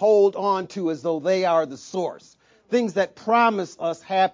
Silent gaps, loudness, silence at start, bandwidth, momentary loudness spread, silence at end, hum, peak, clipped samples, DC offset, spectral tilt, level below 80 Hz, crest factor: none; -23 LUFS; 0 s; 7.6 kHz; 10 LU; 0.05 s; none; -6 dBFS; under 0.1%; under 0.1%; -5.5 dB/octave; -72 dBFS; 16 dB